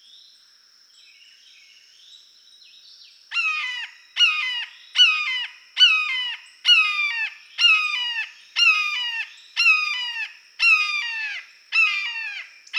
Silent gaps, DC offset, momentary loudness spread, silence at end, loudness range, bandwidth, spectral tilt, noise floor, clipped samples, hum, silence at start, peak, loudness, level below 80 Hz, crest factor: none; under 0.1%; 14 LU; 0 s; 7 LU; 16 kHz; 7.5 dB/octave; -55 dBFS; under 0.1%; none; 2.1 s; -4 dBFS; -19 LUFS; under -90 dBFS; 20 dB